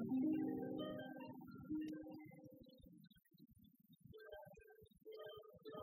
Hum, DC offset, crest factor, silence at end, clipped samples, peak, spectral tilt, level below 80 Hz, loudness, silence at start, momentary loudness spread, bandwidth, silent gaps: none; under 0.1%; 18 dB; 0 s; under 0.1%; -32 dBFS; -8 dB/octave; -78 dBFS; -49 LUFS; 0 s; 26 LU; 16 kHz; none